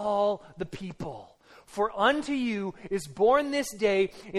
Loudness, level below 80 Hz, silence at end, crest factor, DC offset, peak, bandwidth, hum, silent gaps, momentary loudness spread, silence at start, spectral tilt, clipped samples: -28 LUFS; -58 dBFS; 0 s; 20 dB; under 0.1%; -8 dBFS; 13.5 kHz; none; none; 15 LU; 0 s; -4.5 dB/octave; under 0.1%